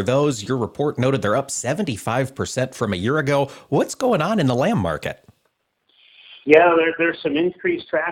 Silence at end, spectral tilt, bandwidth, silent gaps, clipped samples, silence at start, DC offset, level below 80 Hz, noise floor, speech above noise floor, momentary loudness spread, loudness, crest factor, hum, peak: 0 s; -5.5 dB/octave; 16.5 kHz; none; under 0.1%; 0 s; under 0.1%; -56 dBFS; -69 dBFS; 50 dB; 9 LU; -20 LUFS; 20 dB; none; 0 dBFS